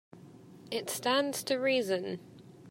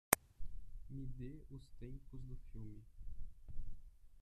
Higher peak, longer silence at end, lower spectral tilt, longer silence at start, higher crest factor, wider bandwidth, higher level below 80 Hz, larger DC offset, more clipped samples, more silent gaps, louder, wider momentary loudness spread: second, -14 dBFS vs -6 dBFS; about the same, 0 s vs 0 s; about the same, -3 dB/octave vs -3.5 dB/octave; about the same, 0.15 s vs 0.1 s; second, 20 dB vs 38 dB; first, 16 kHz vs 14 kHz; second, -82 dBFS vs -52 dBFS; neither; neither; neither; first, -32 LUFS vs -48 LUFS; about the same, 10 LU vs 11 LU